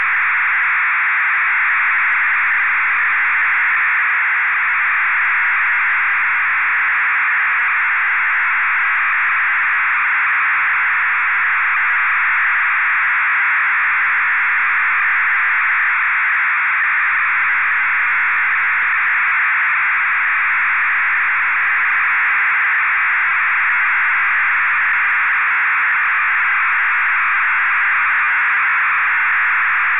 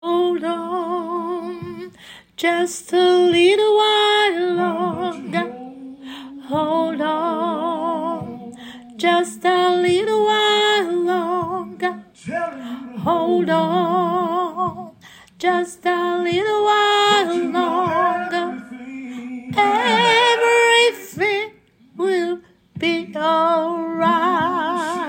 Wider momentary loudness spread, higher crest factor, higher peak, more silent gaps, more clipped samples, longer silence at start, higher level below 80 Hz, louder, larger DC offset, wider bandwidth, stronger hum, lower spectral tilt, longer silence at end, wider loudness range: second, 1 LU vs 17 LU; second, 6 dB vs 16 dB; second, -10 dBFS vs -2 dBFS; neither; neither; about the same, 0 s vs 0.05 s; about the same, -64 dBFS vs -66 dBFS; first, -14 LUFS vs -18 LUFS; neither; second, 4 kHz vs 16.5 kHz; neither; about the same, -4.5 dB/octave vs -4 dB/octave; about the same, 0 s vs 0 s; second, 0 LU vs 5 LU